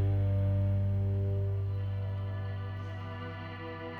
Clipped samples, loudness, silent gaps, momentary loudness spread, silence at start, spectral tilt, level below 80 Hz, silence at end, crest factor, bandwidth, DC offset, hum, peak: under 0.1%; -34 LUFS; none; 11 LU; 0 s; -9.5 dB/octave; -48 dBFS; 0 s; 10 dB; 4.5 kHz; under 0.1%; 50 Hz at -55 dBFS; -22 dBFS